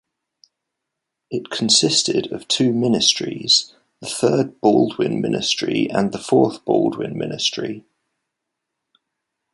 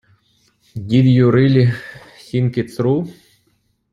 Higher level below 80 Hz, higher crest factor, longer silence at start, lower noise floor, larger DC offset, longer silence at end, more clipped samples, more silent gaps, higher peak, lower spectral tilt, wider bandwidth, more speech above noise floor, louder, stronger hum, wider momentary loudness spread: second, -62 dBFS vs -52 dBFS; about the same, 20 dB vs 16 dB; first, 1.3 s vs 0.75 s; first, -81 dBFS vs -63 dBFS; neither; first, 1.75 s vs 0.8 s; neither; neither; about the same, -2 dBFS vs -2 dBFS; second, -3.5 dB/octave vs -9 dB/octave; first, 11.5 kHz vs 10 kHz; first, 62 dB vs 49 dB; about the same, -18 LUFS vs -16 LUFS; neither; second, 13 LU vs 19 LU